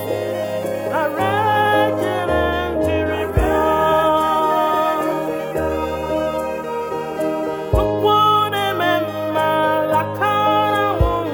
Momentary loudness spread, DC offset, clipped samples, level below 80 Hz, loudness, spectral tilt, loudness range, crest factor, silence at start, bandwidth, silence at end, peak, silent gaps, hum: 7 LU; under 0.1%; under 0.1%; -32 dBFS; -18 LUFS; -6 dB/octave; 3 LU; 14 dB; 0 s; over 20 kHz; 0 s; -4 dBFS; none; none